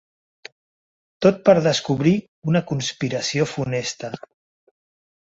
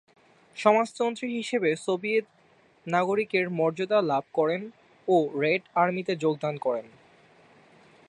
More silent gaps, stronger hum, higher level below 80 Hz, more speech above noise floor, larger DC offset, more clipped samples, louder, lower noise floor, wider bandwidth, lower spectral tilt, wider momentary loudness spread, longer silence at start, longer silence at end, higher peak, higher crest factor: first, 2.28-2.42 s vs none; neither; first, -58 dBFS vs -78 dBFS; first, over 70 dB vs 31 dB; neither; neither; first, -20 LUFS vs -26 LUFS; first, under -90 dBFS vs -57 dBFS; second, 8 kHz vs 11 kHz; about the same, -5.5 dB/octave vs -5.5 dB/octave; first, 12 LU vs 8 LU; first, 1.2 s vs 0.55 s; second, 1.05 s vs 1.2 s; first, -2 dBFS vs -6 dBFS; about the same, 20 dB vs 22 dB